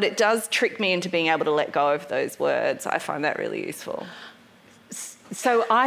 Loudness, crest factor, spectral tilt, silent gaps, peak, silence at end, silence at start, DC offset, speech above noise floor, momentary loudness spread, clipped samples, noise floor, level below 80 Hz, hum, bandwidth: -24 LUFS; 18 dB; -3 dB/octave; none; -6 dBFS; 0 s; 0 s; under 0.1%; 29 dB; 14 LU; under 0.1%; -53 dBFS; -74 dBFS; none; 16 kHz